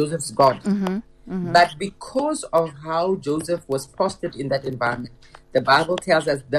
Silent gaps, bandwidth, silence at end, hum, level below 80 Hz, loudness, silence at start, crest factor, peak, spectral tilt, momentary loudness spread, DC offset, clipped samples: none; 13 kHz; 0 s; none; -52 dBFS; -22 LUFS; 0 s; 18 dB; -4 dBFS; -5 dB/octave; 12 LU; under 0.1%; under 0.1%